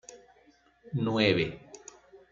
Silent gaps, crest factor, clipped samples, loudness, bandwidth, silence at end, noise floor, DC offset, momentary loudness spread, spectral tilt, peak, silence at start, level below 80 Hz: none; 22 dB; under 0.1%; -28 LUFS; 7.6 kHz; 0.15 s; -63 dBFS; under 0.1%; 25 LU; -5.5 dB/octave; -10 dBFS; 0.1 s; -62 dBFS